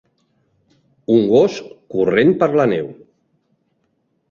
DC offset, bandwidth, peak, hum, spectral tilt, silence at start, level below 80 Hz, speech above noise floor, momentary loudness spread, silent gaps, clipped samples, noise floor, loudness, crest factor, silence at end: under 0.1%; 7.2 kHz; -2 dBFS; none; -7 dB/octave; 1.1 s; -58 dBFS; 52 dB; 18 LU; none; under 0.1%; -67 dBFS; -16 LUFS; 16 dB; 1.4 s